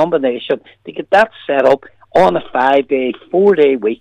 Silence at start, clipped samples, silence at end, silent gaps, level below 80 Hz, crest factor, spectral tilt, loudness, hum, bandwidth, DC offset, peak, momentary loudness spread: 0 s; under 0.1%; 0.05 s; none; -52 dBFS; 12 dB; -6.5 dB/octave; -14 LUFS; none; 9.4 kHz; under 0.1%; -2 dBFS; 9 LU